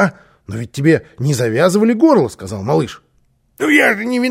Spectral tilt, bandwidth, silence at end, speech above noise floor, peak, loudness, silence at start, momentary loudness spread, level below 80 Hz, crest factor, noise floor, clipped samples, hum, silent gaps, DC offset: -6 dB/octave; 16 kHz; 0 s; 44 dB; 0 dBFS; -14 LUFS; 0 s; 14 LU; -54 dBFS; 14 dB; -58 dBFS; under 0.1%; none; none; under 0.1%